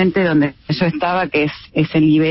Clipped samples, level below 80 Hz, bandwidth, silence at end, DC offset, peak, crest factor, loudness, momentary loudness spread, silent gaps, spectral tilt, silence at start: under 0.1%; -48 dBFS; 5.8 kHz; 0 s; under 0.1%; -2 dBFS; 12 dB; -17 LUFS; 6 LU; none; -10.5 dB/octave; 0 s